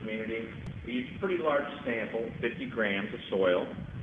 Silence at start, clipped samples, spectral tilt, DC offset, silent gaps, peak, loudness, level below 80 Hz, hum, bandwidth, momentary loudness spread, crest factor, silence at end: 0 s; under 0.1%; -7.5 dB/octave; under 0.1%; none; -14 dBFS; -32 LUFS; -56 dBFS; none; 7.4 kHz; 9 LU; 18 dB; 0 s